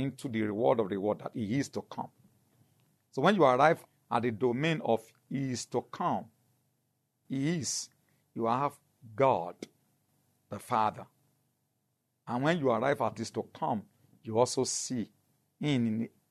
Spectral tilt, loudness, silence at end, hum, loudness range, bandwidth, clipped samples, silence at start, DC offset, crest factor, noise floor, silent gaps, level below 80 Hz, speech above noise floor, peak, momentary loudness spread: -5 dB/octave; -31 LUFS; 0.25 s; none; 6 LU; 13.5 kHz; under 0.1%; 0 s; under 0.1%; 22 dB; -80 dBFS; none; -76 dBFS; 49 dB; -10 dBFS; 14 LU